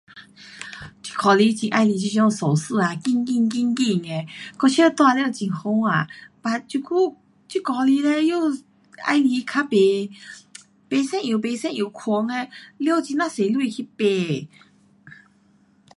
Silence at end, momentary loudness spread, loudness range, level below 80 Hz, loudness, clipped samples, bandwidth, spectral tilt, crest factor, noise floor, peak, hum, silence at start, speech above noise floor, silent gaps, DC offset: 0.9 s; 13 LU; 4 LU; -68 dBFS; -21 LUFS; under 0.1%; 11.5 kHz; -5.5 dB/octave; 18 dB; -58 dBFS; -4 dBFS; none; 0.15 s; 37 dB; none; under 0.1%